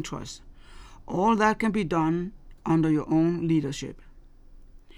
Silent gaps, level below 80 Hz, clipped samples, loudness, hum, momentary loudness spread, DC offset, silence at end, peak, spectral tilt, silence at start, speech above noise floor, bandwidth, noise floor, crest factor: none; -48 dBFS; under 0.1%; -25 LUFS; none; 16 LU; under 0.1%; 0.05 s; -8 dBFS; -6.5 dB/octave; 0 s; 24 dB; 11.5 kHz; -49 dBFS; 20 dB